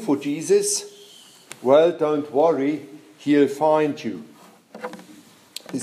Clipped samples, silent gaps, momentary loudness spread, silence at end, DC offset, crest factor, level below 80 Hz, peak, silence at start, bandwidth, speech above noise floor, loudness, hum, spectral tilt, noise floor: under 0.1%; none; 20 LU; 0 s; under 0.1%; 18 dB; -78 dBFS; -4 dBFS; 0 s; 15 kHz; 29 dB; -21 LUFS; none; -4.5 dB/octave; -48 dBFS